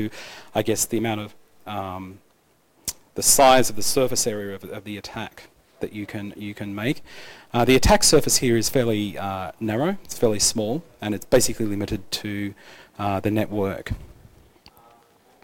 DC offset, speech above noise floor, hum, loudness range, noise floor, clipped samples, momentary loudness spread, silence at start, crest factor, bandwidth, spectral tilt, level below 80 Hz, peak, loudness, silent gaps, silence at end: under 0.1%; 39 dB; none; 8 LU; -61 dBFS; under 0.1%; 18 LU; 0 s; 20 dB; 18 kHz; -3.5 dB/octave; -40 dBFS; -4 dBFS; -22 LUFS; none; 1.35 s